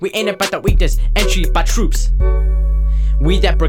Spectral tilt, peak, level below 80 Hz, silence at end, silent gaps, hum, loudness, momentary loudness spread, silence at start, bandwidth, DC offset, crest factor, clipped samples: -5 dB/octave; -2 dBFS; -14 dBFS; 0 s; none; none; -17 LUFS; 2 LU; 0 s; 16 kHz; under 0.1%; 12 dB; under 0.1%